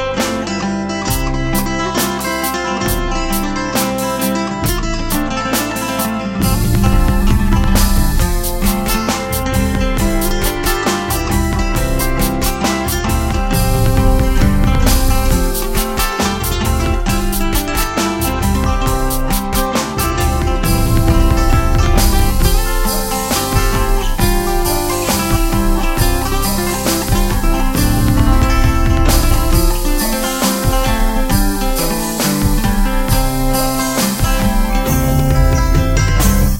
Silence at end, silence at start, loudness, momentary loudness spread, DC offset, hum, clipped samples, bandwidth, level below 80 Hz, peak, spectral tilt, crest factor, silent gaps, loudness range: 0 s; 0 s; -16 LUFS; 4 LU; under 0.1%; none; under 0.1%; 17 kHz; -16 dBFS; 0 dBFS; -4.5 dB/octave; 14 dB; none; 2 LU